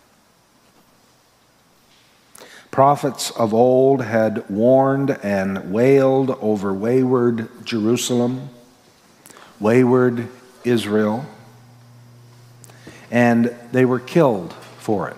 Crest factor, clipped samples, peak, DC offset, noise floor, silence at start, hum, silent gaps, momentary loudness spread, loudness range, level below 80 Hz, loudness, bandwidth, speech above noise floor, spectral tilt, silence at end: 18 dB; under 0.1%; 0 dBFS; under 0.1%; -56 dBFS; 2.4 s; none; none; 12 LU; 5 LU; -68 dBFS; -18 LUFS; 15.5 kHz; 39 dB; -6.5 dB/octave; 0 s